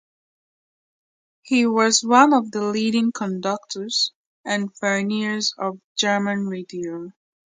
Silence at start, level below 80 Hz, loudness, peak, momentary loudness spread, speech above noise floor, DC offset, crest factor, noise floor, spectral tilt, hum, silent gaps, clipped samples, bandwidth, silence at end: 1.45 s; -72 dBFS; -21 LUFS; 0 dBFS; 14 LU; over 69 dB; under 0.1%; 22 dB; under -90 dBFS; -3.5 dB/octave; none; 4.15-4.44 s, 5.84-5.95 s; under 0.1%; 9.6 kHz; 0.45 s